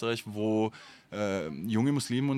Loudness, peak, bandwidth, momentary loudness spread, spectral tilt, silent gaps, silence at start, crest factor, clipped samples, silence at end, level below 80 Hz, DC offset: -31 LUFS; -16 dBFS; 15.5 kHz; 7 LU; -6 dB/octave; none; 0 s; 14 dB; under 0.1%; 0 s; -70 dBFS; under 0.1%